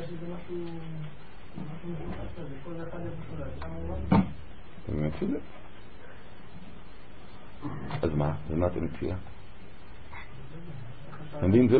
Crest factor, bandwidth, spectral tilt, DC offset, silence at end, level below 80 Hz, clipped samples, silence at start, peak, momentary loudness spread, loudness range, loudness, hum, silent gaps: 22 dB; 4.7 kHz; -12 dB/octave; 2%; 0 s; -46 dBFS; under 0.1%; 0 s; -10 dBFS; 22 LU; 7 LU; -33 LUFS; none; none